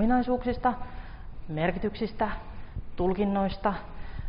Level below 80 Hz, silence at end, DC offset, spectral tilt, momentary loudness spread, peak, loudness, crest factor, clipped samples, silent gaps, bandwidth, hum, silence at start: -40 dBFS; 0 s; under 0.1%; -6 dB/octave; 16 LU; -12 dBFS; -29 LUFS; 16 dB; under 0.1%; none; 5.4 kHz; none; 0 s